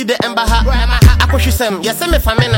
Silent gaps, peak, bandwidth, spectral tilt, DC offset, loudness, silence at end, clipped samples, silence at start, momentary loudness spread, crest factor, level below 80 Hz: none; 0 dBFS; 17 kHz; -5 dB/octave; under 0.1%; -12 LUFS; 0 s; under 0.1%; 0 s; 6 LU; 12 dB; -14 dBFS